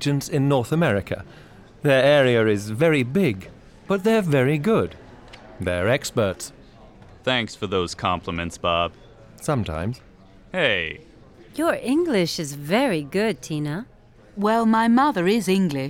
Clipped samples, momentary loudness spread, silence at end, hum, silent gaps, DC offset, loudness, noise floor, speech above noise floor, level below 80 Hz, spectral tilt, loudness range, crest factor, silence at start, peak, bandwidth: under 0.1%; 13 LU; 0 s; none; none; under 0.1%; -22 LUFS; -47 dBFS; 26 dB; -50 dBFS; -5.5 dB/octave; 6 LU; 16 dB; 0 s; -6 dBFS; 17 kHz